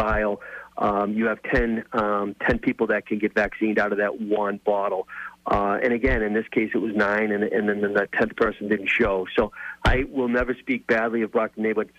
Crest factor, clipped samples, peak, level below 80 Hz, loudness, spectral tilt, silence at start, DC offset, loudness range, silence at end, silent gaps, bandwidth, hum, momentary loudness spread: 16 dB; under 0.1%; -8 dBFS; -38 dBFS; -24 LUFS; -7 dB/octave; 0 s; under 0.1%; 1 LU; 0.1 s; none; 10 kHz; none; 4 LU